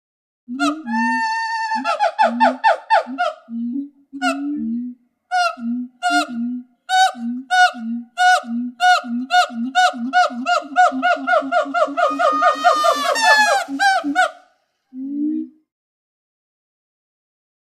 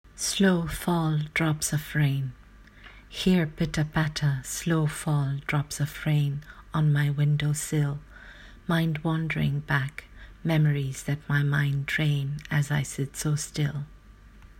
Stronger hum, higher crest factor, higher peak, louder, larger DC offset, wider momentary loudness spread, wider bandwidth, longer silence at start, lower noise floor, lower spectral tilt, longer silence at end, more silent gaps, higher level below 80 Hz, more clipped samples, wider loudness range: neither; about the same, 18 dB vs 16 dB; first, 0 dBFS vs -10 dBFS; first, -18 LUFS vs -27 LUFS; neither; first, 12 LU vs 9 LU; about the same, 15.5 kHz vs 16.5 kHz; first, 0.5 s vs 0.05 s; first, -60 dBFS vs -50 dBFS; second, -2 dB/octave vs -5.5 dB/octave; first, 2.25 s vs 0.15 s; neither; second, -76 dBFS vs -48 dBFS; neither; first, 7 LU vs 1 LU